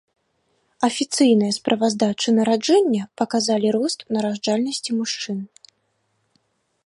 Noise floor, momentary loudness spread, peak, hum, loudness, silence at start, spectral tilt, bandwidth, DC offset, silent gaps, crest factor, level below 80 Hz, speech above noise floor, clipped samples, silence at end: -69 dBFS; 7 LU; -4 dBFS; none; -20 LUFS; 0.8 s; -4 dB/octave; 11.5 kHz; under 0.1%; none; 18 dB; -68 dBFS; 50 dB; under 0.1%; 1.4 s